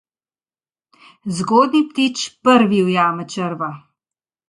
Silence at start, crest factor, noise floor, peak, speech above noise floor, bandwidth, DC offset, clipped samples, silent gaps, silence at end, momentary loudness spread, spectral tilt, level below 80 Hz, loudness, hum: 1.25 s; 18 dB; under -90 dBFS; 0 dBFS; over 73 dB; 11.5 kHz; under 0.1%; under 0.1%; none; 0.7 s; 13 LU; -5 dB/octave; -64 dBFS; -17 LUFS; none